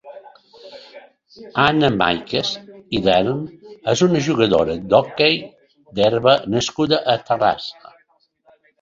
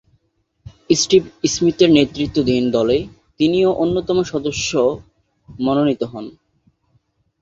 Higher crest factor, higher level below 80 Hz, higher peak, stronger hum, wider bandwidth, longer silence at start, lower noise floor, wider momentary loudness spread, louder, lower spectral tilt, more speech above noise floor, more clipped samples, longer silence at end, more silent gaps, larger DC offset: about the same, 18 dB vs 18 dB; about the same, -50 dBFS vs -46 dBFS; about the same, 0 dBFS vs -2 dBFS; neither; about the same, 7.8 kHz vs 7.8 kHz; second, 0.05 s vs 0.65 s; second, -61 dBFS vs -66 dBFS; about the same, 12 LU vs 10 LU; about the same, -18 LUFS vs -17 LUFS; about the same, -5 dB/octave vs -4.5 dB/octave; second, 43 dB vs 49 dB; neither; about the same, 1.1 s vs 1.1 s; neither; neither